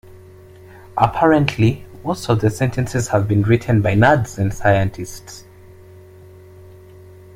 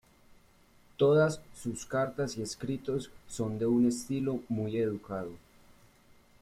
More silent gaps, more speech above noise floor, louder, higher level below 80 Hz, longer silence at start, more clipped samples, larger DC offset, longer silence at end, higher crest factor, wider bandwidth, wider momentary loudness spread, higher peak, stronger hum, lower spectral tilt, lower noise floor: neither; second, 26 dB vs 31 dB; first, -17 LUFS vs -32 LUFS; first, -42 dBFS vs -62 dBFS; second, 0.15 s vs 1 s; neither; neither; first, 1.95 s vs 1.05 s; about the same, 18 dB vs 18 dB; about the same, 15.5 kHz vs 15 kHz; first, 16 LU vs 13 LU; first, 0 dBFS vs -14 dBFS; neither; about the same, -6.5 dB/octave vs -6.5 dB/octave; second, -42 dBFS vs -62 dBFS